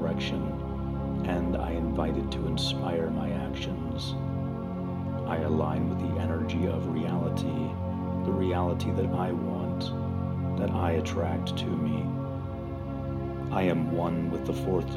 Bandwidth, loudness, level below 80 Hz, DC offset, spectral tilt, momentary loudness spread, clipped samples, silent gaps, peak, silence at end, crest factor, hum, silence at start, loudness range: 13.5 kHz; -30 LUFS; -42 dBFS; under 0.1%; -7.5 dB/octave; 6 LU; under 0.1%; none; -14 dBFS; 0 s; 16 dB; none; 0 s; 2 LU